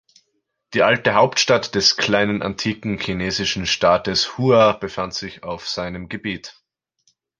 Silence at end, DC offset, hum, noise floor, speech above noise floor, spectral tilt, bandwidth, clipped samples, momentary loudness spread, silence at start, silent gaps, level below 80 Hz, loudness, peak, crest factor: 0.9 s; under 0.1%; none; -72 dBFS; 53 dB; -3.5 dB/octave; 10.5 kHz; under 0.1%; 13 LU; 0.7 s; none; -48 dBFS; -19 LUFS; -2 dBFS; 18 dB